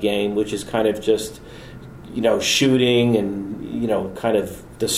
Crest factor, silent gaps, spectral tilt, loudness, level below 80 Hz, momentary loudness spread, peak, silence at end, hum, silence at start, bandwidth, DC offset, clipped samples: 16 dB; none; -4.5 dB/octave; -20 LUFS; -48 dBFS; 19 LU; -4 dBFS; 0 s; none; 0 s; 16 kHz; under 0.1%; under 0.1%